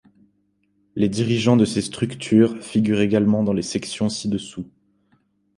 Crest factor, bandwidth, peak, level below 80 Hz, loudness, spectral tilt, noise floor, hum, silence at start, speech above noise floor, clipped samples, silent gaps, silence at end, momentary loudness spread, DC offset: 18 dB; 11.5 kHz; -2 dBFS; -54 dBFS; -20 LUFS; -6 dB/octave; -66 dBFS; none; 0.95 s; 46 dB; under 0.1%; none; 0.9 s; 11 LU; under 0.1%